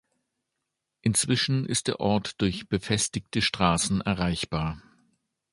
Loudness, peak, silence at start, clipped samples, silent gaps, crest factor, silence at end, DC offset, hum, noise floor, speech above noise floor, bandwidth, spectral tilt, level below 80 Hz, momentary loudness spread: -26 LUFS; -6 dBFS; 1.05 s; under 0.1%; none; 22 dB; 0.75 s; under 0.1%; none; -83 dBFS; 57 dB; 12 kHz; -4 dB/octave; -48 dBFS; 7 LU